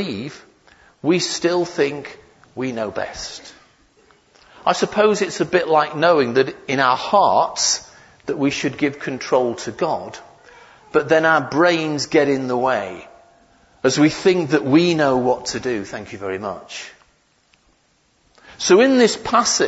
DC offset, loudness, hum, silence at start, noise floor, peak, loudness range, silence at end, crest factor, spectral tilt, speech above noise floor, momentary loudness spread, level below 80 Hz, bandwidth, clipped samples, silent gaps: under 0.1%; -18 LUFS; none; 0 s; -61 dBFS; -2 dBFS; 7 LU; 0 s; 18 dB; -4 dB/octave; 43 dB; 16 LU; -56 dBFS; 8 kHz; under 0.1%; none